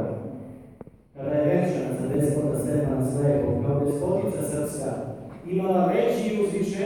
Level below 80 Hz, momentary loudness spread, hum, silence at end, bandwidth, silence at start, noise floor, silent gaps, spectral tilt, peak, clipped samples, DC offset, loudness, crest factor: -50 dBFS; 13 LU; none; 0 s; 17 kHz; 0 s; -47 dBFS; none; -7.5 dB/octave; -10 dBFS; under 0.1%; under 0.1%; -25 LUFS; 16 dB